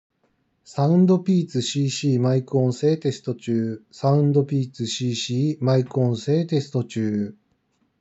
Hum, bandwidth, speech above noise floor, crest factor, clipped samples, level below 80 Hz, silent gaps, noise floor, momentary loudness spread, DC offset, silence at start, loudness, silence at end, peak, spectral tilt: none; 8 kHz; 47 dB; 16 dB; under 0.1%; -76 dBFS; none; -68 dBFS; 9 LU; under 0.1%; 0.7 s; -22 LUFS; 0.7 s; -6 dBFS; -7 dB/octave